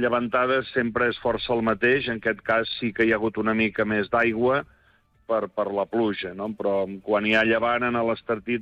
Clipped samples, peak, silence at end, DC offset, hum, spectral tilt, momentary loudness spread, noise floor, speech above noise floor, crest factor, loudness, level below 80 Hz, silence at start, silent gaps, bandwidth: under 0.1%; -10 dBFS; 0 s; under 0.1%; none; -7 dB/octave; 6 LU; -61 dBFS; 37 dB; 14 dB; -24 LUFS; -54 dBFS; 0 s; none; 7.2 kHz